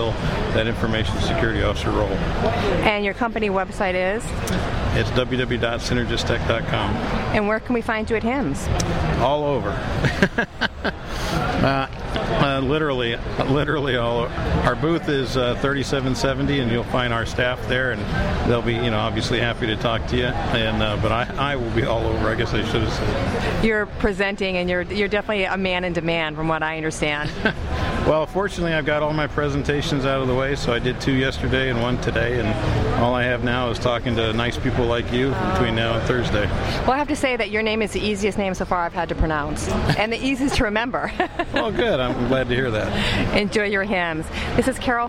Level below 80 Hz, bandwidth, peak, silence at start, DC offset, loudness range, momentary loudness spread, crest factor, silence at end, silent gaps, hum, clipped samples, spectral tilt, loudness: -32 dBFS; 16 kHz; -4 dBFS; 0 s; under 0.1%; 1 LU; 3 LU; 16 dB; 0 s; none; none; under 0.1%; -5.5 dB/octave; -22 LUFS